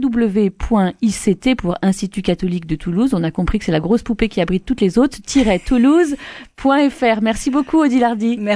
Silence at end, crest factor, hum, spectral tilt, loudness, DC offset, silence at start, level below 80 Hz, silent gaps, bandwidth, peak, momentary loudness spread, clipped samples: 0 s; 14 dB; none; -6 dB/octave; -17 LUFS; under 0.1%; 0 s; -34 dBFS; none; 11 kHz; -2 dBFS; 6 LU; under 0.1%